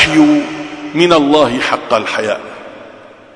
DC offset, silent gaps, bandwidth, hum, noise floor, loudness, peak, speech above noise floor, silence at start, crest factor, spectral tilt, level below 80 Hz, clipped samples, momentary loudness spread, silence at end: under 0.1%; none; 10.5 kHz; none; -37 dBFS; -12 LUFS; 0 dBFS; 26 dB; 0 s; 14 dB; -4.5 dB/octave; -44 dBFS; under 0.1%; 18 LU; 0.3 s